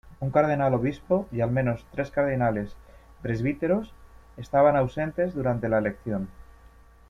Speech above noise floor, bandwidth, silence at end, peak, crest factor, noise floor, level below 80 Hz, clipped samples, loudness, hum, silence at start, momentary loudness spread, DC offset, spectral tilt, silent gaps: 27 dB; 7.4 kHz; 0.75 s; -8 dBFS; 18 dB; -52 dBFS; -48 dBFS; under 0.1%; -26 LUFS; none; 0.05 s; 11 LU; under 0.1%; -9 dB/octave; none